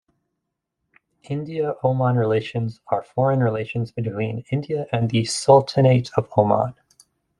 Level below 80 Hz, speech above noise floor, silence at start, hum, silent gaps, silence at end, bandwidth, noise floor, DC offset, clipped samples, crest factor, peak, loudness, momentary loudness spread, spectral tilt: -60 dBFS; 59 dB; 1.3 s; none; none; 0.7 s; 11.5 kHz; -79 dBFS; under 0.1%; under 0.1%; 20 dB; -2 dBFS; -21 LUFS; 12 LU; -6.5 dB/octave